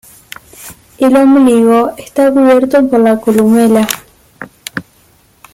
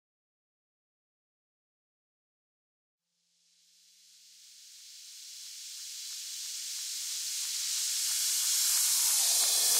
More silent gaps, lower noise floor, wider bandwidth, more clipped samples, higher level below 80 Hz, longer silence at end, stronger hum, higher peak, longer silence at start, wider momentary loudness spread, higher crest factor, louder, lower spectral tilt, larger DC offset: neither; second, -48 dBFS vs -74 dBFS; about the same, 16.5 kHz vs 16 kHz; neither; first, -50 dBFS vs under -90 dBFS; first, 0.75 s vs 0 s; neither; first, 0 dBFS vs -14 dBFS; second, 0.6 s vs 4.4 s; about the same, 19 LU vs 21 LU; second, 10 dB vs 22 dB; first, -9 LUFS vs -28 LUFS; first, -5.5 dB/octave vs 5.5 dB/octave; neither